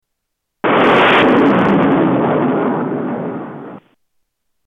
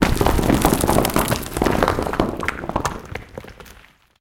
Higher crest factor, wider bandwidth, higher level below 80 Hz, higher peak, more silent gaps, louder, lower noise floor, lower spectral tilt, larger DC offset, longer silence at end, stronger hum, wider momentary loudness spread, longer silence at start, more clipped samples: second, 12 dB vs 20 dB; second, 7.8 kHz vs 17 kHz; second, -54 dBFS vs -30 dBFS; about the same, -2 dBFS vs -2 dBFS; neither; first, -13 LUFS vs -20 LUFS; first, -74 dBFS vs -48 dBFS; first, -7.5 dB/octave vs -5 dB/octave; neither; first, 0.9 s vs 0.5 s; neither; about the same, 15 LU vs 17 LU; first, 0.65 s vs 0 s; neither